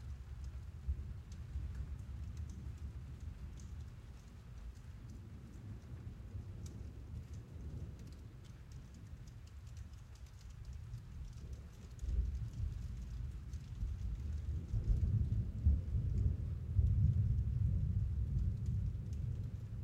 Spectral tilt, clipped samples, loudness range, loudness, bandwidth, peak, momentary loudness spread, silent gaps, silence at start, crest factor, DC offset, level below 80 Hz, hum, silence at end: -8 dB/octave; under 0.1%; 16 LU; -42 LUFS; 8.4 kHz; -20 dBFS; 17 LU; none; 0 s; 20 dB; under 0.1%; -44 dBFS; none; 0 s